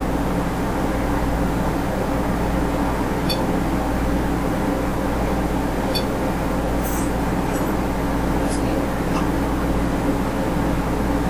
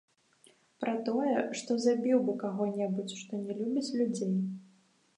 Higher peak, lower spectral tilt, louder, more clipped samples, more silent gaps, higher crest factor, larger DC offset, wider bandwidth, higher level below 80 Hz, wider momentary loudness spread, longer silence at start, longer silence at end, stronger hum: first, -8 dBFS vs -16 dBFS; about the same, -6 dB/octave vs -6 dB/octave; first, -22 LUFS vs -32 LUFS; neither; neither; second, 12 dB vs 18 dB; neither; first, 19.5 kHz vs 10.5 kHz; first, -28 dBFS vs -84 dBFS; second, 1 LU vs 10 LU; second, 0 s vs 0.8 s; second, 0 s vs 0.55 s; first, 60 Hz at -35 dBFS vs none